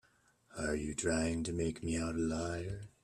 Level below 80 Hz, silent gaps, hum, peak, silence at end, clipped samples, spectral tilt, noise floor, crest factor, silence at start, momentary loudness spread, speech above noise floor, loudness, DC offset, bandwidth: -54 dBFS; none; none; -20 dBFS; 0.15 s; under 0.1%; -5 dB/octave; -70 dBFS; 18 dB; 0.5 s; 8 LU; 33 dB; -37 LUFS; under 0.1%; 12 kHz